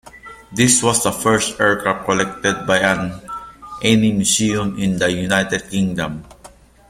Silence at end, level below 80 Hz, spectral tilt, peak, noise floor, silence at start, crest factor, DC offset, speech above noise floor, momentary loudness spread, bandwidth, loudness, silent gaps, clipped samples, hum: 0.4 s; -46 dBFS; -3.5 dB/octave; 0 dBFS; -45 dBFS; 0.05 s; 18 dB; under 0.1%; 27 dB; 13 LU; 16 kHz; -17 LUFS; none; under 0.1%; none